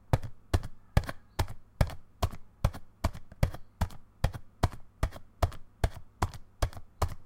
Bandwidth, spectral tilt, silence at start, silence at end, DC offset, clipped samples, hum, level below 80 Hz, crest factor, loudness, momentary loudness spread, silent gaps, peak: 17 kHz; -6 dB/octave; 0.1 s; 0 s; under 0.1%; under 0.1%; none; -36 dBFS; 24 dB; -36 LUFS; 5 LU; none; -8 dBFS